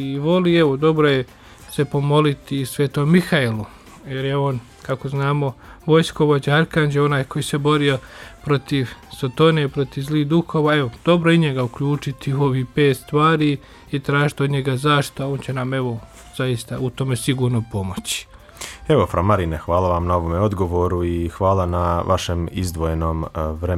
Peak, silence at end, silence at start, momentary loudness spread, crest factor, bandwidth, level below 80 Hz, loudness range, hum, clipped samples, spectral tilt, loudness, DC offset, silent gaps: -4 dBFS; 0 s; 0 s; 10 LU; 16 dB; 14 kHz; -40 dBFS; 3 LU; none; under 0.1%; -6.5 dB/octave; -20 LUFS; under 0.1%; none